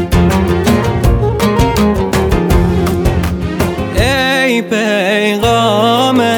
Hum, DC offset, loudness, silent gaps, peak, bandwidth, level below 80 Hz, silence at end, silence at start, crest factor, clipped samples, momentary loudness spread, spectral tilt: none; under 0.1%; -12 LUFS; none; 0 dBFS; over 20 kHz; -22 dBFS; 0 s; 0 s; 10 dB; under 0.1%; 4 LU; -5.5 dB/octave